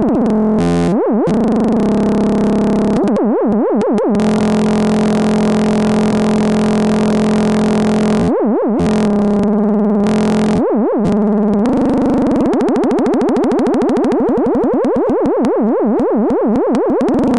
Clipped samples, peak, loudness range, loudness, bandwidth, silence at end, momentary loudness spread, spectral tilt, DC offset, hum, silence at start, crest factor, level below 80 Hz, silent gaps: under 0.1%; -4 dBFS; 0 LU; -13 LUFS; 11.5 kHz; 0 s; 1 LU; -7.5 dB/octave; 0.9%; none; 0 s; 8 dB; -40 dBFS; none